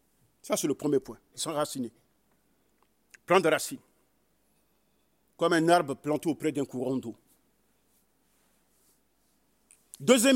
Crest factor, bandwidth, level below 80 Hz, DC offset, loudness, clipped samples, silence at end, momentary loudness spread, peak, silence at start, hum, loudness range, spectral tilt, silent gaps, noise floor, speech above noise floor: 22 dB; 16 kHz; -74 dBFS; under 0.1%; -28 LUFS; under 0.1%; 0 s; 15 LU; -8 dBFS; 0.45 s; none; 8 LU; -4 dB/octave; none; -72 dBFS; 45 dB